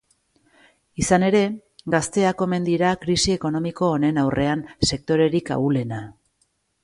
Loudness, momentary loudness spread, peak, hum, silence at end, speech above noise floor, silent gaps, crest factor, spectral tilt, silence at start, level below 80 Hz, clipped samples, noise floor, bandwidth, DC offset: -21 LUFS; 7 LU; -4 dBFS; none; 0.7 s; 48 dB; none; 18 dB; -5 dB/octave; 1 s; -46 dBFS; under 0.1%; -68 dBFS; 11.5 kHz; under 0.1%